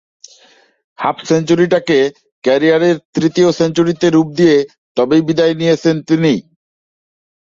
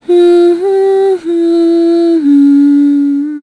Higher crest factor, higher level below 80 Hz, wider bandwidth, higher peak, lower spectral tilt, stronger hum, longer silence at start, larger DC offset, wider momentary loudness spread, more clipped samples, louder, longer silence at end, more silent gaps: first, 14 dB vs 6 dB; first, -54 dBFS vs -64 dBFS; second, 7.6 kHz vs 10.5 kHz; about the same, 0 dBFS vs -2 dBFS; about the same, -6 dB/octave vs -5.5 dB/octave; neither; first, 1 s vs 0.1 s; neither; first, 8 LU vs 5 LU; neither; second, -14 LUFS vs -8 LUFS; first, 1.15 s vs 0 s; first, 2.32-2.42 s, 3.05-3.13 s, 4.78-4.95 s vs none